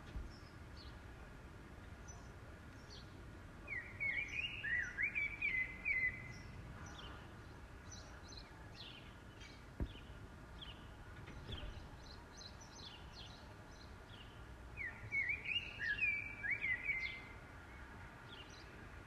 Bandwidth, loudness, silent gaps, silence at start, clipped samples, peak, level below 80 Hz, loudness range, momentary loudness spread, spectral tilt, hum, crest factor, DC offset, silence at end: 14.5 kHz; -42 LUFS; none; 0 s; under 0.1%; -28 dBFS; -58 dBFS; 14 LU; 18 LU; -3.5 dB/octave; none; 18 dB; under 0.1%; 0 s